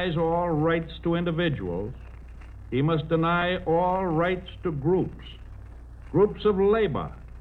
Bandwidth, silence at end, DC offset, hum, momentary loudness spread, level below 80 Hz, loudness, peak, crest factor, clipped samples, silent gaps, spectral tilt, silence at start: 4.4 kHz; 0 s; under 0.1%; none; 22 LU; -42 dBFS; -25 LUFS; -10 dBFS; 14 dB; under 0.1%; none; -9 dB/octave; 0 s